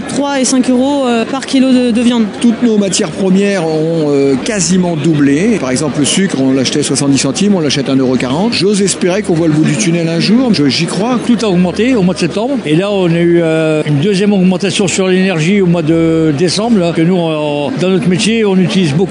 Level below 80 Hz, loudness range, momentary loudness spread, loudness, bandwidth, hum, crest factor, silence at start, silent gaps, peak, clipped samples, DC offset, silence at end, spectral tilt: -46 dBFS; 1 LU; 3 LU; -11 LUFS; 11 kHz; none; 10 dB; 0 s; none; 0 dBFS; under 0.1%; under 0.1%; 0 s; -5 dB/octave